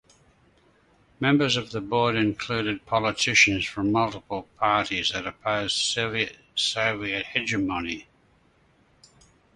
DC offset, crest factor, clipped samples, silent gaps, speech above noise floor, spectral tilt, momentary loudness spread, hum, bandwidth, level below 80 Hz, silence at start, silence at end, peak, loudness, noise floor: under 0.1%; 22 dB; under 0.1%; none; 37 dB; -3.5 dB/octave; 8 LU; none; 11.5 kHz; -54 dBFS; 1.2 s; 1.55 s; -6 dBFS; -24 LUFS; -62 dBFS